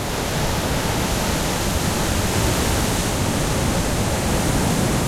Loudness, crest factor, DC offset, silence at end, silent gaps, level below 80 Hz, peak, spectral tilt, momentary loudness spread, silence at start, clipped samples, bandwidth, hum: -21 LUFS; 14 dB; under 0.1%; 0 s; none; -28 dBFS; -6 dBFS; -4 dB/octave; 2 LU; 0 s; under 0.1%; 16.5 kHz; none